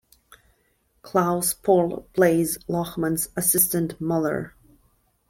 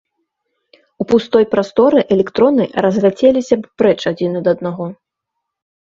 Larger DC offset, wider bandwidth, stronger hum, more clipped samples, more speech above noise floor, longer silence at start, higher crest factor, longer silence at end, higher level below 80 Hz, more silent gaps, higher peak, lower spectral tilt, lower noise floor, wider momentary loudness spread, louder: neither; first, 16.5 kHz vs 7.6 kHz; neither; neither; second, 44 dB vs 64 dB; about the same, 1.05 s vs 1 s; about the same, 20 dB vs 16 dB; second, 0.8 s vs 1 s; about the same, -56 dBFS vs -54 dBFS; neither; second, -4 dBFS vs 0 dBFS; second, -4.5 dB/octave vs -7 dB/octave; second, -67 dBFS vs -77 dBFS; about the same, 8 LU vs 7 LU; second, -22 LUFS vs -14 LUFS